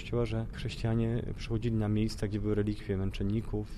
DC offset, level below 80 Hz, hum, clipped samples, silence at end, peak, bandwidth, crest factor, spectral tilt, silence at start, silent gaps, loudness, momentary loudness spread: under 0.1%; -42 dBFS; none; under 0.1%; 0 s; -18 dBFS; 12 kHz; 14 dB; -7.5 dB/octave; 0 s; none; -33 LUFS; 5 LU